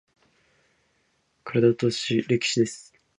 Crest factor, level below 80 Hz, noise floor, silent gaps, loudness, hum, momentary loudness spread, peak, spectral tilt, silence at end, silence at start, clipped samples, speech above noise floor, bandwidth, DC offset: 20 dB; -66 dBFS; -69 dBFS; none; -24 LUFS; none; 13 LU; -8 dBFS; -5 dB/octave; 0.4 s; 1.45 s; under 0.1%; 46 dB; 10.5 kHz; under 0.1%